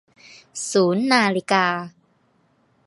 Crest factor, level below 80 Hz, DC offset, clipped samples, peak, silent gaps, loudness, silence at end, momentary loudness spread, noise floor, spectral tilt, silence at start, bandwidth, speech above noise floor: 20 dB; -72 dBFS; under 0.1%; under 0.1%; -2 dBFS; none; -20 LUFS; 1 s; 15 LU; -63 dBFS; -4 dB/octave; 0.55 s; 11.5 kHz; 43 dB